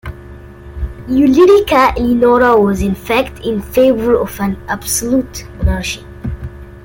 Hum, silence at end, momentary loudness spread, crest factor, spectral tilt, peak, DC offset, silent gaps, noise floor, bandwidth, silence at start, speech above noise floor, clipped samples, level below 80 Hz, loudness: none; 0.05 s; 18 LU; 12 dB; -5 dB/octave; 0 dBFS; under 0.1%; none; -33 dBFS; 17 kHz; 0.05 s; 21 dB; under 0.1%; -28 dBFS; -13 LUFS